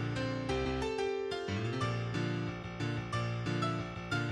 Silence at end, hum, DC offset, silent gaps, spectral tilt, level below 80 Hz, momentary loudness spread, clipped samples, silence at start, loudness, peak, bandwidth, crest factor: 0 s; none; under 0.1%; none; -6 dB/octave; -52 dBFS; 3 LU; under 0.1%; 0 s; -36 LUFS; -22 dBFS; 10.5 kHz; 14 dB